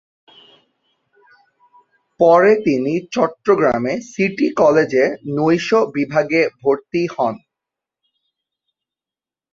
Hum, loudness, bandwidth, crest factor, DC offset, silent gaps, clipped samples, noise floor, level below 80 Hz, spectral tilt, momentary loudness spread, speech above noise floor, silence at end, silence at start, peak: none; -17 LUFS; 7.6 kHz; 16 dB; under 0.1%; none; under 0.1%; under -90 dBFS; -58 dBFS; -6.5 dB/octave; 8 LU; over 74 dB; 2.15 s; 2.2 s; -2 dBFS